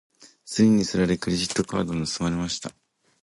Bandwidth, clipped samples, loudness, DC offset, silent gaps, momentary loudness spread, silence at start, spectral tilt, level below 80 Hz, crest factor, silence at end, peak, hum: 11.5 kHz; under 0.1%; -24 LUFS; under 0.1%; none; 11 LU; 0.2 s; -5 dB/octave; -50 dBFS; 18 dB; 0.55 s; -8 dBFS; none